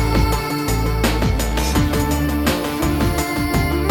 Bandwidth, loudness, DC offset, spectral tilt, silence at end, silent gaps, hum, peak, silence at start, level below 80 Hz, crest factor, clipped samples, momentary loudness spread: 19.5 kHz; -19 LUFS; under 0.1%; -5 dB/octave; 0 s; none; none; -4 dBFS; 0 s; -22 dBFS; 14 dB; under 0.1%; 2 LU